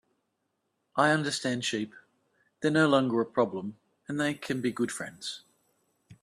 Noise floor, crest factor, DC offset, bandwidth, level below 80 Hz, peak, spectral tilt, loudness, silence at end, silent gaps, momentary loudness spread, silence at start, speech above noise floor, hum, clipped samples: -79 dBFS; 22 dB; under 0.1%; 13.5 kHz; -72 dBFS; -10 dBFS; -4.5 dB/octave; -29 LUFS; 0.1 s; none; 15 LU; 0.95 s; 51 dB; none; under 0.1%